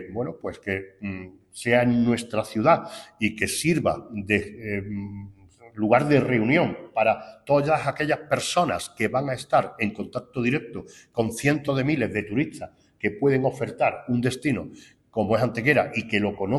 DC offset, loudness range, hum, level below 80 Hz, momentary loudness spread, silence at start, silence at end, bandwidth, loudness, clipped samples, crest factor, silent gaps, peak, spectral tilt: under 0.1%; 3 LU; none; -56 dBFS; 13 LU; 0 s; 0 s; 13 kHz; -24 LUFS; under 0.1%; 20 dB; none; -4 dBFS; -5.5 dB/octave